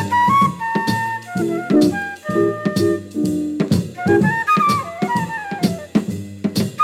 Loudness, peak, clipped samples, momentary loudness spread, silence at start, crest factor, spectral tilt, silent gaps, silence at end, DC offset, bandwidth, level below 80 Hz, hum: -19 LUFS; -4 dBFS; under 0.1%; 7 LU; 0 s; 14 dB; -6 dB/octave; none; 0 s; under 0.1%; 16.5 kHz; -54 dBFS; none